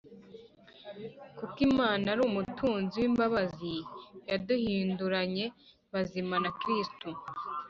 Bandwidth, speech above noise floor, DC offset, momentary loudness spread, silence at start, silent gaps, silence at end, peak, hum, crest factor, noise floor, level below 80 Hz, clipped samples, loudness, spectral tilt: 7.4 kHz; 24 dB; under 0.1%; 18 LU; 0.05 s; none; 0 s; -16 dBFS; none; 18 dB; -55 dBFS; -62 dBFS; under 0.1%; -32 LUFS; -4 dB/octave